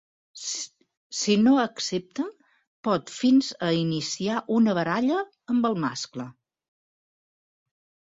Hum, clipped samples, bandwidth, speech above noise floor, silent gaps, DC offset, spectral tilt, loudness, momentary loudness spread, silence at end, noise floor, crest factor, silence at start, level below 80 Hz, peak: none; under 0.1%; 8 kHz; over 66 dB; 0.97-1.10 s, 2.67-2.83 s; under 0.1%; -4.5 dB/octave; -25 LUFS; 14 LU; 1.8 s; under -90 dBFS; 16 dB; 0.35 s; -68 dBFS; -10 dBFS